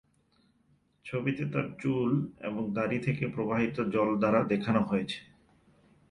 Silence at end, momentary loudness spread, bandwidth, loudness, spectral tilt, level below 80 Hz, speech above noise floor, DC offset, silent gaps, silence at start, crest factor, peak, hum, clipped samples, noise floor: 0.9 s; 9 LU; 10.5 kHz; -30 LUFS; -8 dB/octave; -62 dBFS; 39 dB; under 0.1%; none; 1.05 s; 20 dB; -12 dBFS; none; under 0.1%; -69 dBFS